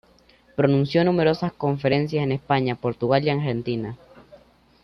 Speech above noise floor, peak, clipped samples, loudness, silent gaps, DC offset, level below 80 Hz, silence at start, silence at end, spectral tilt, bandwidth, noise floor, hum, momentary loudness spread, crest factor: 34 dB; -6 dBFS; under 0.1%; -22 LUFS; none; under 0.1%; -56 dBFS; 0.6 s; 0.9 s; -8.5 dB/octave; 6.4 kHz; -56 dBFS; none; 9 LU; 18 dB